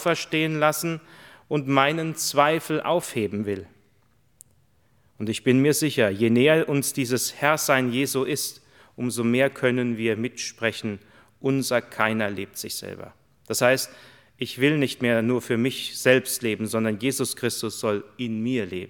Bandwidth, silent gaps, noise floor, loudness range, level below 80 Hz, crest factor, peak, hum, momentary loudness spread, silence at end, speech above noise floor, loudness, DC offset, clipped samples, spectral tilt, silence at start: 19.5 kHz; none; -64 dBFS; 5 LU; -70 dBFS; 22 dB; -2 dBFS; none; 11 LU; 0 s; 40 dB; -24 LUFS; under 0.1%; under 0.1%; -4.5 dB/octave; 0 s